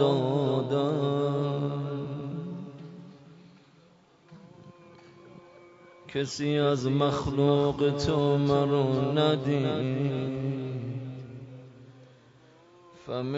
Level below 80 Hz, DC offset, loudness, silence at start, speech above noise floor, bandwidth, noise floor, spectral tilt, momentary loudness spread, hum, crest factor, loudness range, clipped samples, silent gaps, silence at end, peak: -58 dBFS; under 0.1%; -28 LUFS; 0 s; 33 dB; 7.8 kHz; -59 dBFS; -7 dB/octave; 18 LU; none; 18 dB; 15 LU; under 0.1%; none; 0 s; -10 dBFS